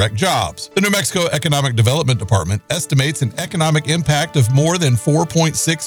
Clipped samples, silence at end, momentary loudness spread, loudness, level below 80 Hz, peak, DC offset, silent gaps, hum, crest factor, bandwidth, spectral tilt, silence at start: under 0.1%; 0 s; 4 LU; -16 LUFS; -44 dBFS; -2 dBFS; under 0.1%; none; none; 14 dB; over 20 kHz; -4.5 dB/octave; 0 s